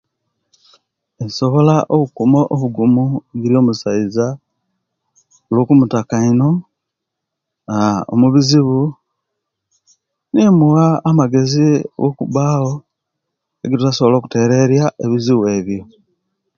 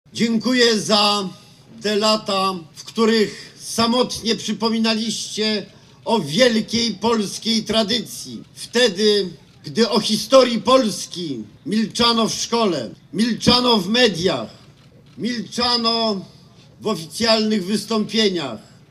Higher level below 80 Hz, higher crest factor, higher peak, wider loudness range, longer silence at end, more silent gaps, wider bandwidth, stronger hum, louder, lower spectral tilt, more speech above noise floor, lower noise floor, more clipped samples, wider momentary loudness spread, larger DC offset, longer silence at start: about the same, -52 dBFS vs -54 dBFS; second, 14 dB vs 20 dB; about the same, 0 dBFS vs 0 dBFS; about the same, 3 LU vs 3 LU; first, 0.75 s vs 0.3 s; neither; second, 7.4 kHz vs 14.5 kHz; neither; first, -14 LUFS vs -19 LUFS; first, -7 dB/octave vs -3.5 dB/octave; first, 65 dB vs 28 dB; first, -79 dBFS vs -47 dBFS; neither; second, 9 LU vs 14 LU; neither; first, 1.2 s vs 0.15 s